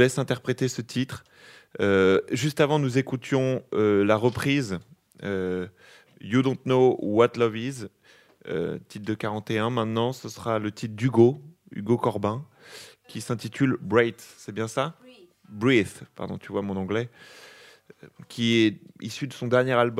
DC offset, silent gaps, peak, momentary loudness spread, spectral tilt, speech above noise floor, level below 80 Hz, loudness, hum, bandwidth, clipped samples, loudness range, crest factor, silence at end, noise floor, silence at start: under 0.1%; none; -4 dBFS; 18 LU; -6 dB/octave; 22 dB; -66 dBFS; -25 LUFS; none; 15.5 kHz; under 0.1%; 5 LU; 20 dB; 0 s; -47 dBFS; 0 s